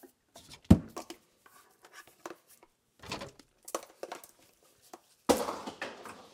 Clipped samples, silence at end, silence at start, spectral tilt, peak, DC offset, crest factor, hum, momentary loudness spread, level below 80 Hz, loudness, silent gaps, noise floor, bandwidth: under 0.1%; 0.15 s; 0.05 s; -6 dB/octave; -6 dBFS; under 0.1%; 30 dB; none; 29 LU; -50 dBFS; -33 LUFS; none; -65 dBFS; 17 kHz